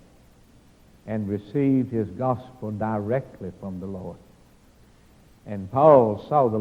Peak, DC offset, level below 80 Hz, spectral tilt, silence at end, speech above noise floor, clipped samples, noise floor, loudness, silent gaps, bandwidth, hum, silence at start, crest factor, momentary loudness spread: -2 dBFS; under 0.1%; -58 dBFS; -10 dB/octave; 0 s; 32 dB; under 0.1%; -54 dBFS; -23 LUFS; none; 8.8 kHz; none; 1.05 s; 22 dB; 20 LU